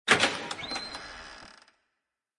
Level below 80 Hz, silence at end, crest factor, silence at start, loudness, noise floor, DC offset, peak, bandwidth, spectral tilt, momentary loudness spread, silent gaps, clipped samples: -62 dBFS; 0.85 s; 26 dB; 0.05 s; -29 LUFS; -84 dBFS; under 0.1%; -6 dBFS; 11.5 kHz; -1.5 dB/octave; 24 LU; none; under 0.1%